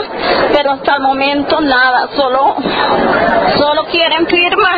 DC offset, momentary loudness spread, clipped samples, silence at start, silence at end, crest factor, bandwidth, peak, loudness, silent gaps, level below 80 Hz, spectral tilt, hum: under 0.1%; 3 LU; under 0.1%; 0 s; 0 s; 12 dB; 5.6 kHz; 0 dBFS; -11 LUFS; none; -40 dBFS; -7 dB/octave; none